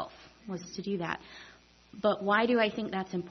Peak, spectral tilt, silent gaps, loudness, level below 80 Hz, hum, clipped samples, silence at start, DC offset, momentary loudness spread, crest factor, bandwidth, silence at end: -14 dBFS; -5.5 dB/octave; none; -31 LUFS; -68 dBFS; none; under 0.1%; 0 s; under 0.1%; 19 LU; 18 dB; 6.4 kHz; 0 s